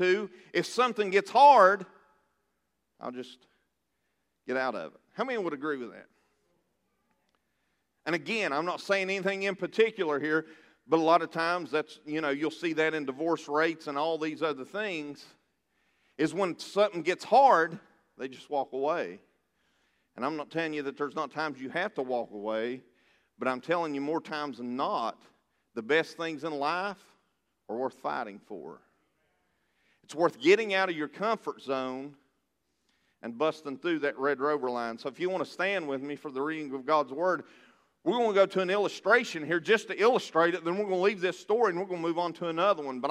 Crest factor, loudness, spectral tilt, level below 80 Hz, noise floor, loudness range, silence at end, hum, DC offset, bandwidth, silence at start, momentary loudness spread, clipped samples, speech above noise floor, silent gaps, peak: 24 dB; -29 LUFS; -4.5 dB/octave; -86 dBFS; -80 dBFS; 10 LU; 0 s; none; under 0.1%; 13.5 kHz; 0 s; 13 LU; under 0.1%; 51 dB; none; -6 dBFS